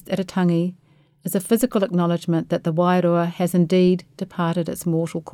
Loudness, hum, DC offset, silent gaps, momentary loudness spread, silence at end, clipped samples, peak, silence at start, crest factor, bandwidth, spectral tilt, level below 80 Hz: -21 LUFS; none; under 0.1%; none; 8 LU; 0.05 s; under 0.1%; -6 dBFS; 0.1 s; 16 dB; 16 kHz; -7 dB/octave; -60 dBFS